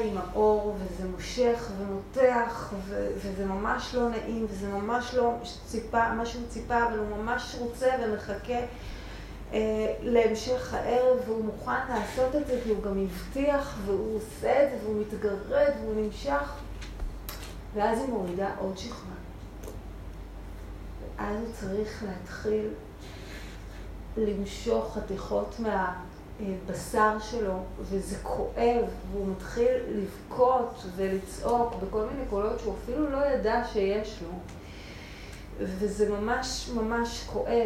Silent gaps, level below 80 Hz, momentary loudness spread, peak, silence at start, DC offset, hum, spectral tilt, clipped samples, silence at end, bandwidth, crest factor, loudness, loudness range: none; -44 dBFS; 17 LU; -10 dBFS; 0 s; under 0.1%; none; -5.5 dB/octave; under 0.1%; 0 s; 16 kHz; 20 dB; -30 LUFS; 6 LU